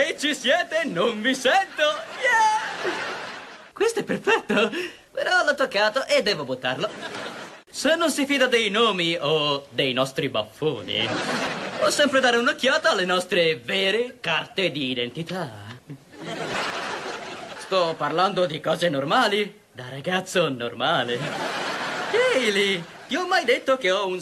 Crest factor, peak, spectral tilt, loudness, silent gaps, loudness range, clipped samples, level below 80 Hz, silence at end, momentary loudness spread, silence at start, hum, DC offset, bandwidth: 16 dB; -6 dBFS; -3.5 dB/octave; -23 LUFS; none; 5 LU; under 0.1%; -66 dBFS; 0 s; 13 LU; 0 s; none; under 0.1%; 13 kHz